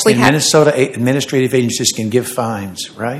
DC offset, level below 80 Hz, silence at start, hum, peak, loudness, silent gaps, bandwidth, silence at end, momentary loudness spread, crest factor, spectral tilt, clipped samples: under 0.1%; -52 dBFS; 0 s; none; 0 dBFS; -14 LUFS; none; 16.5 kHz; 0 s; 11 LU; 14 dB; -4 dB/octave; 0.3%